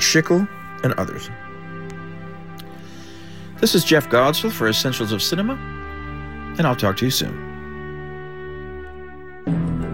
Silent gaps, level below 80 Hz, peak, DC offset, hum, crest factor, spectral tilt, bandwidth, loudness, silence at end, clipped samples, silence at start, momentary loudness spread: none; -44 dBFS; -4 dBFS; 1%; none; 20 dB; -4 dB/octave; 16.5 kHz; -20 LUFS; 0 s; under 0.1%; 0 s; 21 LU